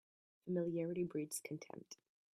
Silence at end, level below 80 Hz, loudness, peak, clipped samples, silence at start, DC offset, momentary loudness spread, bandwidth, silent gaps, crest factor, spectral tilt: 0.4 s; -82 dBFS; -43 LUFS; -28 dBFS; under 0.1%; 0.45 s; under 0.1%; 17 LU; 14.5 kHz; none; 16 dB; -6 dB/octave